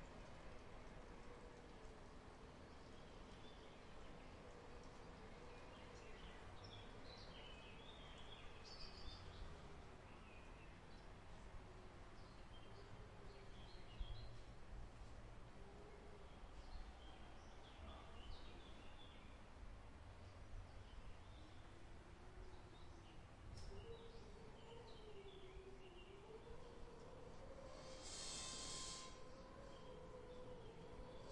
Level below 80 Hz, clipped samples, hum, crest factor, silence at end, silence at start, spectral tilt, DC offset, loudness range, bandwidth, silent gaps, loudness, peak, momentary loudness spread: -62 dBFS; under 0.1%; none; 20 dB; 0 s; 0 s; -3.5 dB/octave; under 0.1%; 8 LU; 11 kHz; none; -59 LUFS; -38 dBFS; 5 LU